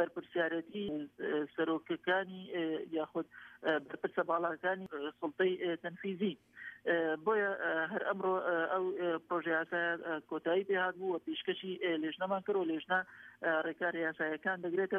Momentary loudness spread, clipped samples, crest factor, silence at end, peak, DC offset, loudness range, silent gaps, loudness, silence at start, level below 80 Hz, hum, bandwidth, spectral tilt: 7 LU; under 0.1%; 16 dB; 0 s; -18 dBFS; under 0.1%; 3 LU; none; -36 LUFS; 0 s; -80 dBFS; none; 4.2 kHz; -7.5 dB/octave